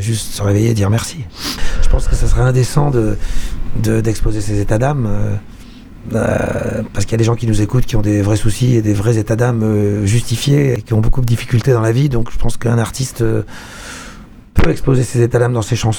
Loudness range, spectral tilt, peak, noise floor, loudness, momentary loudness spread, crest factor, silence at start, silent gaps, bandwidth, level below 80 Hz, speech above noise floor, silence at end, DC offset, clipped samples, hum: 4 LU; -6.5 dB/octave; 0 dBFS; -35 dBFS; -16 LUFS; 9 LU; 14 dB; 0 s; none; 18 kHz; -22 dBFS; 22 dB; 0 s; under 0.1%; under 0.1%; none